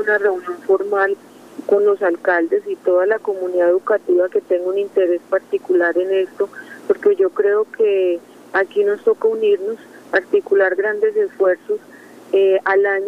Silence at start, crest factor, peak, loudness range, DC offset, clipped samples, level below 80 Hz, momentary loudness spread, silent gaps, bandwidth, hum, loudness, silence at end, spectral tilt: 0 s; 14 dB; -2 dBFS; 1 LU; under 0.1%; under 0.1%; -70 dBFS; 7 LU; none; 7 kHz; none; -18 LUFS; 0 s; -5.5 dB/octave